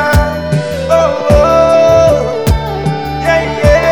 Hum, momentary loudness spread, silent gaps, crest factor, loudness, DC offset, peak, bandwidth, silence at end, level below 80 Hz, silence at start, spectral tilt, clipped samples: none; 8 LU; none; 10 dB; -11 LUFS; 1%; 0 dBFS; over 20 kHz; 0 s; -20 dBFS; 0 s; -6 dB/octave; 0.8%